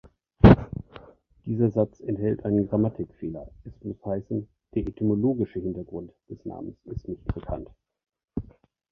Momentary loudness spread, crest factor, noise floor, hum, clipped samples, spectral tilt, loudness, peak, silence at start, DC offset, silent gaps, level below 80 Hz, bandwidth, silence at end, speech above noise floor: 19 LU; 24 dB; -54 dBFS; none; under 0.1%; -10.5 dB/octave; -25 LUFS; -2 dBFS; 0.45 s; under 0.1%; none; -38 dBFS; 6 kHz; 0.5 s; 25 dB